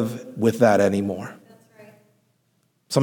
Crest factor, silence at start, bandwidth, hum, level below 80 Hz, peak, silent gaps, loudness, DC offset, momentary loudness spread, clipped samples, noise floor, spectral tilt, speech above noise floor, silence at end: 20 dB; 0 s; 19 kHz; none; -70 dBFS; -4 dBFS; none; -21 LUFS; under 0.1%; 15 LU; under 0.1%; -68 dBFS; -6 dB/octave; 47 dB; 0 s